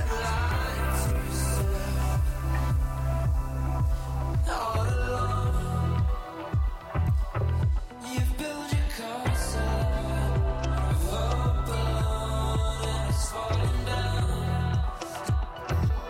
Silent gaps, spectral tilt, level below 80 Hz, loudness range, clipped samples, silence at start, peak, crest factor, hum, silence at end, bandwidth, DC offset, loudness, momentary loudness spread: none; -5.5 dB/octave; -30 dBFS; 1 LU; under 0.1%; 0 s; -16 dBFS; 10 dB; none; 0 s; 17 kHz; under 0.1%; -29 LUFS; 3 LU